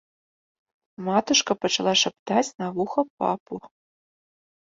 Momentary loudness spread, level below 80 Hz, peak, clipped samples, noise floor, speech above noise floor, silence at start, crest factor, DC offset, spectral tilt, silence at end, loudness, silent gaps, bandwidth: 12 LU; -68 dBFS; -6 dBFS; under 0.1%; under -90 dBFS; over 66 dB; 1 s; 20 dB; under 0.1%; -3 dB/octave; 1.05 s; -24 LUFS; 2.19-2.26 s, 3.10-3.17 s, 3.40-3.46 s; 7.8 kHz